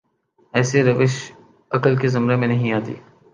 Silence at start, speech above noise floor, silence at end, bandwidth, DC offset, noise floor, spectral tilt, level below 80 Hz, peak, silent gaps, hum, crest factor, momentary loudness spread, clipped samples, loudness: 0.55 s; 43 dB; 0.35 s; 9.4 kHz; under 0.1%; -61 dBFS; -6.5 dB/octave; -62 dBFS; -2 dBFS; none; none; 18 dB; 14 LU; under 0.1%; -19 LUFS